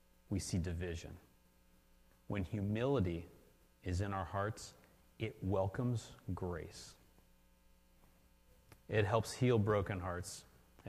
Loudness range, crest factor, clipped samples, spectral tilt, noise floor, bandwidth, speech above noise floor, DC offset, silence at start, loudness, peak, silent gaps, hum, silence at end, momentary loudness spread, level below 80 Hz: 5 LU; 22 dB; under 0.1%; -6.5 dB/octave; -69 dBFS; 14.5 kHz; 31 dB; under 0.1%; 0.3 s; -39 LUFS; -18 dBFS; none; none; 0 s; 17 LU; -58 dBFS